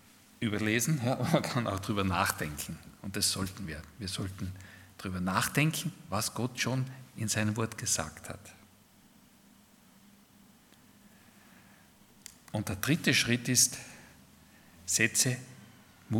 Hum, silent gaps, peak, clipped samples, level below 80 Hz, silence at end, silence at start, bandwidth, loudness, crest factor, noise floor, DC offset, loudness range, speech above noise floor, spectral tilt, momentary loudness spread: none; none; -10 dBFS; under 0.1%; -62 dBFS; 0 s; 0.4 s; 18 kHz; -31 LUFS; 24 dB; -61 dBFS; under 0.1%; 9 LU; 29 dB; -3.5 dB/octave; 19 LU